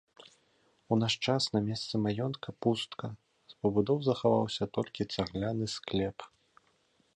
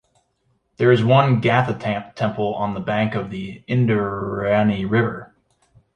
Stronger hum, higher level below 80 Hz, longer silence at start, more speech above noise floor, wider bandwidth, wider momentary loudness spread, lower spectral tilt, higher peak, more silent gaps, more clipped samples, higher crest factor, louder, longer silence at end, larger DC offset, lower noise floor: neither; second, -60 dBFS vs -52 dBFS; about the same, 0.9 s vs 0.8 s; second, 40 dB vs 48 dB; first, 11 kHz vs 8.6 kHz; about the same, 9 LU vs 10 LU; second, -6 dB/octave vs -8.5 dB/octave; second, -14 dBFS vs -2 dBFS; neither; neither; about the same, 20 dB vs 18 dB; second, -32 LUFS vs -20 LUFS; first, 0.9 s vs 0.7 s; neither; first, -71 dBFS vs -67 dBFS